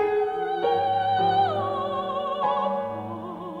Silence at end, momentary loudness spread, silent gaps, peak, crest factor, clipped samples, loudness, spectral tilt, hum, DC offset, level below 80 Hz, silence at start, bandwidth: 0 s; 11 LU; none; -12 dBFS; 14 dB; under 0.1%; -25 LUFS; -7 dB/octave; none; under 0.1%; -64 dBFS; 0 s; 7.2 kHz